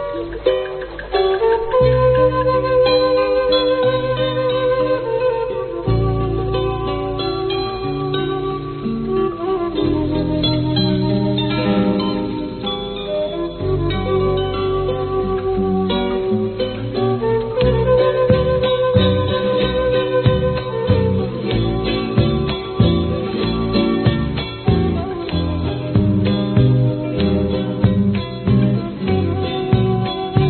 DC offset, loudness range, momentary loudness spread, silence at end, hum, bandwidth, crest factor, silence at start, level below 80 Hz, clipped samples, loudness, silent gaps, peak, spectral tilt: under 0.1%; 5 LU; 7 LU; 0 s; none; 4.5 kHz; 16 dB; 0 s; -32 dBFS; under 0.1%; -18 LUFS; none; 0 dBFS; -6 dB/octave